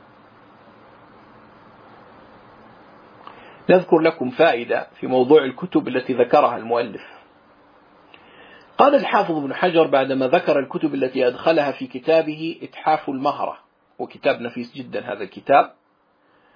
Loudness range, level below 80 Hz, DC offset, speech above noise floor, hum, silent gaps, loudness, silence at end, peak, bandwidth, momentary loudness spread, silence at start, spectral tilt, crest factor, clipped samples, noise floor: 5 LU; -70 dBFS; under 0.1%; 42 dB; none; none; -20 LUFS; 0.85 s; 0 dBFS; 5.2 kHz; 14 LU; 3.3 s; -7.5 dB/octave; 20 dB; under 0.1%; -61 dBFS